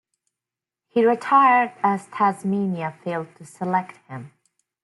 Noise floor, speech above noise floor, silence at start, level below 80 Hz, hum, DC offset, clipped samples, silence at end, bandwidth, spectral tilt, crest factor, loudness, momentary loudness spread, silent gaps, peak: -88 dBFS; 67 dB; 0.95 s; -74 dBFS; none; under 0.1%; under 0.1%; 0.55 s; 12 kHz; -7 dB/octave; 16 dB; -21 LUFS; 21 LU; none; -6 dBFS